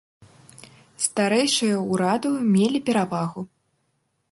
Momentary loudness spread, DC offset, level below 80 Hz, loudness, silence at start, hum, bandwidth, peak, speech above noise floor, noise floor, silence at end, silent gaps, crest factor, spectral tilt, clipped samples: 9 LU; under 0.1%; -68 dBFS; -22 LUFS; 1 s; none; 11.5 kHz; -6 dBFS; 50 dB; -72 dBFS; 0.85 s; none; 18 dB; -4.5 dB/octave; under 0.1%